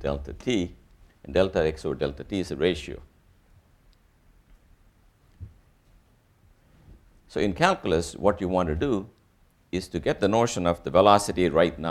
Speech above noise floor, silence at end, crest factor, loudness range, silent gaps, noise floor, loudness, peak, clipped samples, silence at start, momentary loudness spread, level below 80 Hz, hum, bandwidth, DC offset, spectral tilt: 37 dB; 0 s; 24 dB; 10 LU; none; -62 dBFS; -25 LUFS; -2 dBFS; under 0.1%; 0 s; 13 LU; -46 dBFS; none; 15 kHz; under 0.1%; -5.5 dB/octave